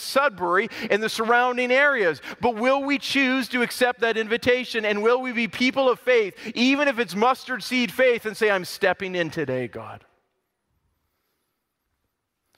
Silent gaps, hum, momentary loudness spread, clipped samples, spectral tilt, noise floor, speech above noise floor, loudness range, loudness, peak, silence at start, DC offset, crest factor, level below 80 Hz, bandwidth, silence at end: none; none; 6 LU; under 0.1%; -4 dB/octave; -77 dBFS; 55 dB; 8 LU; -22 LUFS; -6 dBFS; 0 s; under 0.1%; 18 dB; -64 dBFS; 16 kHz; 2.6 s